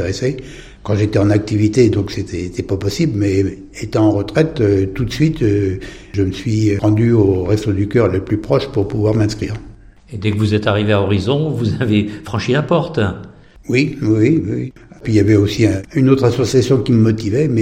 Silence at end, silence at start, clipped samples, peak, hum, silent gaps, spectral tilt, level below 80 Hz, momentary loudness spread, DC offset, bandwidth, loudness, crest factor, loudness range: 0 s; 0 s; under 0.1%; 0 dBFS; none; none; -7 dB/octave; -38 dBFS; 10 LU; under 0.1%; 10 kHz; -16 LUFS; 16 dB; 3 LU